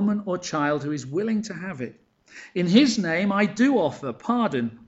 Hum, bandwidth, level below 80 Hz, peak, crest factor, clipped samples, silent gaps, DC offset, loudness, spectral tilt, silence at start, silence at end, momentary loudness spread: none; 8.2 kHz; -64 dBFS; -6 dBFS; 18 dB; under 0.1%; none; under 0.1%; -24 LUFS; -5.5 dB/octave; 0 s; 0.1 s; 14 LU